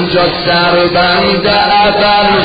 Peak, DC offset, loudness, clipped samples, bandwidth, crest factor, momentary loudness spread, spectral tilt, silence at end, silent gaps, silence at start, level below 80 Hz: 0 dBFS; under 0.1%; -9 LUFS; under 0.1%; 5 kHz; 10 dB; 2 LU; -7 dB/octave; 0 s; none; 0 s; -34 dBFS